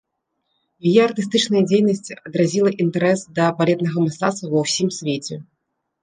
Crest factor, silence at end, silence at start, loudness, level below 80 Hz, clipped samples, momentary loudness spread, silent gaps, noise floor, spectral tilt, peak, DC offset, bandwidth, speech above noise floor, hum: 18 dB; 0.6 s; 0.85 s; -19 LUFS; -64 dBFS; under 0.1%; 9 LU; none; -75 dBFS; -5.5 dB/octave; -2 dBFS; under 0.1%; 9.8 kHz; 56 dB; none